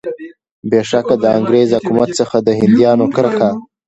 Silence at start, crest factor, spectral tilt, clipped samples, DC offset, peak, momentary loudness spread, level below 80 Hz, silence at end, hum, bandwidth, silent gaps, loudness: 0.05 s; 14 dB; -6.5 dB/octave; under 0.1%; under 0.1%; 0 dBFS; 7 LU; -52 dBFS; 0.25 s; none; 8.2 kHz; 0.51-0.63 s; -13 LUFS